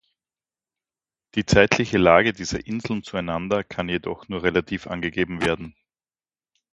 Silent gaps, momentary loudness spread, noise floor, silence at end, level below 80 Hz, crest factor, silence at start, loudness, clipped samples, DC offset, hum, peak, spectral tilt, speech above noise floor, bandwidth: none; 13 LU; under -90 dBFS; 1 s; -46 dBFS; 24 dB; 1.35 s; -22 LUFS; under 0.1%; under 0.1%; none; 0 dBFS; -5 dB/octave; over 68 dB; 11.5 kHz